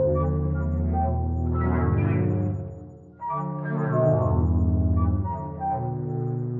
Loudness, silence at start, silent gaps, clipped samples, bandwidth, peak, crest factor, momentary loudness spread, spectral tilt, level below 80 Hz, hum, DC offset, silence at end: -25 LUFS; 0 s; none; under 0.1%; 2.8 kHz; -10 dBFS; 14 dB; 8 LU; -12.5 dB/octave; -36 dBFS; none; under 0.1%; 0 s